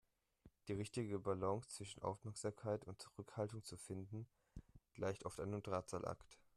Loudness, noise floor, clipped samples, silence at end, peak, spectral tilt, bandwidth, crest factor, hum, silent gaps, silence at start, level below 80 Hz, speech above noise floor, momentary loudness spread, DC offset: -47 LUFS; -72 dBFS; under 0.1%; 0.2 s; -28 dBFS; -6 dB/octave; 13.5 kHz; 20 dB; none; none; 0.45 s; -72 dBFS; 25 dB; 13 LU; under 0.1%